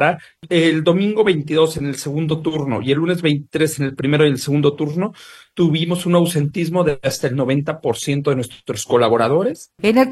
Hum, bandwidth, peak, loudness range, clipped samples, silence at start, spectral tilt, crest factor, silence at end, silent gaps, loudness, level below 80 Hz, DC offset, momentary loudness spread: none; 13 kHz; -2 dBFS; 1 LU; under 0.1%; 0 s; -6 dB/octave; 16 dB; 0 s; none; -18 LUFS; -54 dBFS; under 0.1%; 7 LU